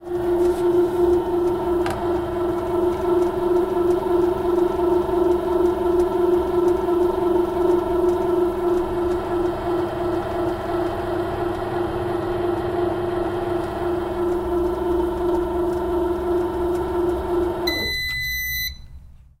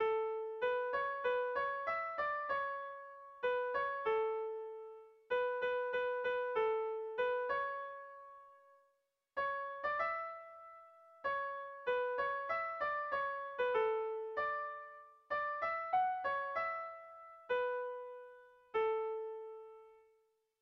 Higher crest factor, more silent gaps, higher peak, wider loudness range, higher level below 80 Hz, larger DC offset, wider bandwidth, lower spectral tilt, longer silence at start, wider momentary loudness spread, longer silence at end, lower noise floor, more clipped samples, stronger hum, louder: about the same, 12 dB vs 16 dB; neither; first, -8 dBFS vs -24 dBFS; about the same, 4 LU vs 4 LU; first, -38 dBFS vs -76 dBFS; neither; first, 15.5 kHz vs 6 kHz; first, -6 dB/octave vs 0.5 dB/octave; about the same, 0 s vs 0 s; second, 5 LU vs 17 LU; second, 0.25 s vs 0.65 s; second, -42 dBFS vs -80 dBFS; neither; neither; first, -22 LUFS vs -38 LUFS